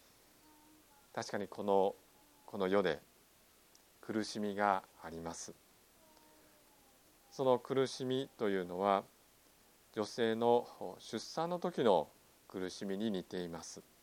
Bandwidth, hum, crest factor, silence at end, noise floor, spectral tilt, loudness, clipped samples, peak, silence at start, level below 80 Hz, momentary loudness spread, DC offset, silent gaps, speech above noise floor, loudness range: 17 kHz; none; 22 dB; 0.2 s; -67 dBFS; -5 dB/octave; -37 LUFS; under 0.1%; -16 dBFS; 1.15 s; -76 dBFS; 16 LU; under 0.1%; none; 31 dB; 5 LU